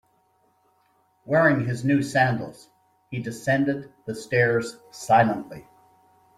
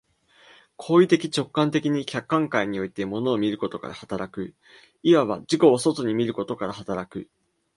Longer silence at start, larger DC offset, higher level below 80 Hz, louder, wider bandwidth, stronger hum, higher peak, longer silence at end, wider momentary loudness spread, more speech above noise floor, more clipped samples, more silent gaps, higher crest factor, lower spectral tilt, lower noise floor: first, 1.25 s vs 0.8 s; neither; about the same, -62 dBFS vs -62 dBFS; about the same, -23 LUFS vs -24 LUFS; first, 14.5 kHz vs 11.5 kHz; neither; about the same, -6 dBFS vs -4 dBFS; first, 0.75 s vs 0.5 s; about the same, 16 LU vs 15 LU; first, 42 dB vs 33 dB; neither; neither; about the same, 20 dB vs 20 dB; about the same, -6.5 dB/octave vs -6 dB/octave; first, -65 dBFS vs -56 dBFS